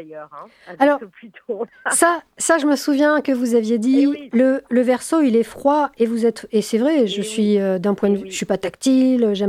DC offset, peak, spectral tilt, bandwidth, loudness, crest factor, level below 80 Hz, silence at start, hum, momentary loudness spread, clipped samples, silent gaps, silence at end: under 0.1%; -2 dBFS; -4.5 dB/octave; 15.5 kHz; -18 LUFS; 16 dB; -60 dBFS; 0 s; none; 7 LU; under 0.1%; none; 0 s